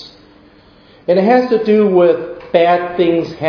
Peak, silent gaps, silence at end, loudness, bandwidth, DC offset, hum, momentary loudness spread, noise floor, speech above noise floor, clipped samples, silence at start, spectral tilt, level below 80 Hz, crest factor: 0 dBFS; none; 0 s; -13 LUFS; 5.4 kHz; under 0.1%; none; 6 LU; -45 dBFS; 33 dB; under 0.1%; 0 s; -8 dB/octave; -54 dBFS; 14 dB